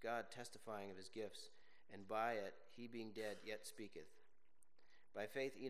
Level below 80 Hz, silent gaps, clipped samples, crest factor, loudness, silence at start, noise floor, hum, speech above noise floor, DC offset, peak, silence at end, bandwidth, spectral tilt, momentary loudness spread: -88 dBFS; none; under 0.1%; 22 dB; -50 LUFS; 0 s; -81 dBFS; none; 32 dB; 0.1%; -30 dBFS; 0 s; 15 kHz; -4 dB/octave; 16 LU